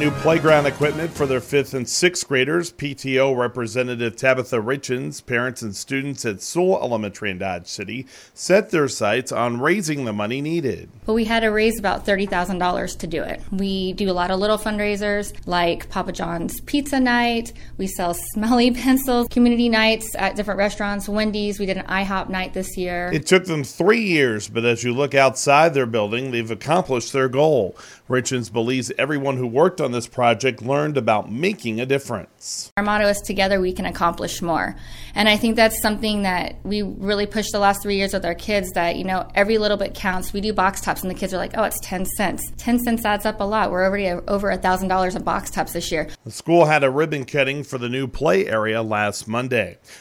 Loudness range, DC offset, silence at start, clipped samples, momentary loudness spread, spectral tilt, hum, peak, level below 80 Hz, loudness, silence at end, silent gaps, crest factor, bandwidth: 4 LU; under 0.1%; 0 s; under 0.1%; 9 LU; -4.5 dB/octave; none; -2 dBFS; -40 dBFS; -21 LUFS; 0 s; 32.71-32.76 s; 18 dB; 17.5 kHz